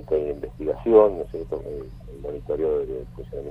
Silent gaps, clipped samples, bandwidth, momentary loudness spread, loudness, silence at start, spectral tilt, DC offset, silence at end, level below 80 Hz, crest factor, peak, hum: none; under 0.1%; 4.9 kHz; 19 LU; -23 LUFS; 0 s; -9.5 dB/octave; under 0.1%; 0 s; -42 dBFS; 20 dB; -4 dBFS; none